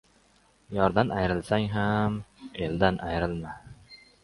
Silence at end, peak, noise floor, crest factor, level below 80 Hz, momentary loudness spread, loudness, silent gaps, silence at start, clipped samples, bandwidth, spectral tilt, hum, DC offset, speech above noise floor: 0.25 s; -6 dBFS; -63 dBFS; 24 dB; -46 dBFS; 16 LU; -28 LUFS; none; 0.7 s; under 0.1%; 11.5 kHz; -7.5 dB/octave; none; under 0.1%; 36 dB